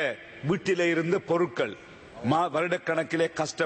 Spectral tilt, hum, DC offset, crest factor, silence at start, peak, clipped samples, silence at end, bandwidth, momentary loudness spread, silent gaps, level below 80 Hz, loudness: -5.5 dB/octave; none; under 0.1%; 14 dB; 0 s; -12 dBFS; under 0.1%; 0 s; 8.8 kHz; 9 LU; none; -66 dBFS; -27 LUFS